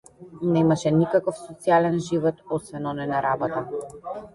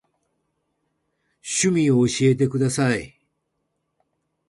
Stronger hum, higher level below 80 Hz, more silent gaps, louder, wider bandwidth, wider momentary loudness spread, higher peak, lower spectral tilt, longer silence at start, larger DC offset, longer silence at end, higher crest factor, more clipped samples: neither; about the same, -58 dBFS vs -58 dBFS; neither; second, -24 LUFS vs -20 LUFS; about the same, 11.5 kHz vs 11.5 kHz; first, 11 LU vs 8 LU; about the same, -8 dBFS vs -6 dBFS; first, -7 dB/octave vs -5 dB/octave; second, 0.2 s vs 1.45 s; neither; second, 0.05 s vs 1.4 s; about the same, 16 dB vs 18 dB; neither